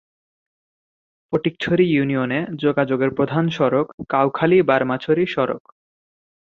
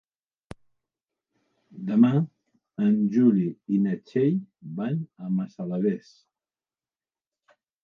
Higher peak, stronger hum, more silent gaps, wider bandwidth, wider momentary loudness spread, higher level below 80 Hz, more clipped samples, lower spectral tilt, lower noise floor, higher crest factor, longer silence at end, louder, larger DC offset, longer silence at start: first, -2 dBFS vs -8 dBFS; neither; first, 3.94-3.98 s vs none; about the same, 7 kHz vs 6.4 kHz; second, 7 LU vs 13 LU; first, -58 dBFS vs -68 dBFS; neither; second, -8 dB/octave vs -10 dB/octave; about the same, under -90 dBFS vs under -90 dBFS; about the same, 18 dB vs 20 dB; second, 1 s vs 1.85 s; first, -19 LUFS vs -25 LUFS; neither; second, 1.3 s vs 1.75 s